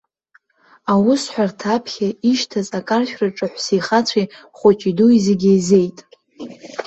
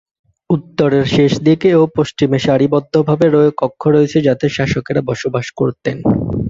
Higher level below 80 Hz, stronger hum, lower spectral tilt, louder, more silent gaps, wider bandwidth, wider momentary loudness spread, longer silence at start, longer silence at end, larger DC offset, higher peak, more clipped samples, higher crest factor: second, -58 dBFS vs -42 dBFS; neither; second, -5.5 dB/octave vs -7 dB/octave; second, -17 LUFS vs -14 LUFS; neither; about the same, 8.4 kHz vs 7.8 kHz; first, 12 LU vs 7 LU; first, 0.85 s vs 0.5 s; about the same, 0.05 s vs 0 s; neither; about the same, -2 dBFS vs -2 dBFS; neither; about the same, 16 dB vs 12 dB